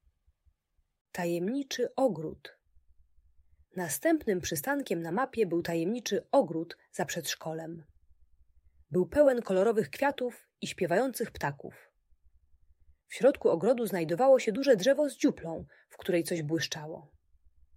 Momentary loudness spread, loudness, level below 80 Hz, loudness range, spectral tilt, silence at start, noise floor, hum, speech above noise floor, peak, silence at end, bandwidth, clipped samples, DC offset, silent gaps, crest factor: 15 LU; -30 LUFS; -64 dBFS; 7 LU; -5 dB/octave; 1.15 s; -76 dBFS; none; 46 dB; -12 dBFS; 0.75 s; 16 kHz; under 0.1%; under 0.1%; none; 20 dB